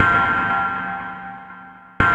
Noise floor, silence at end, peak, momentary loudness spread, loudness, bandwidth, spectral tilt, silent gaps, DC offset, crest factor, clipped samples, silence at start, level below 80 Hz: -41 dBFS; 0 s; -2 dBFS; 21 LU; -20 LUFS; 9.2 kHz; -6 dB/octave; none; under 0.1%; 18 dB; under 0.1%; 0 s; -42 dBFS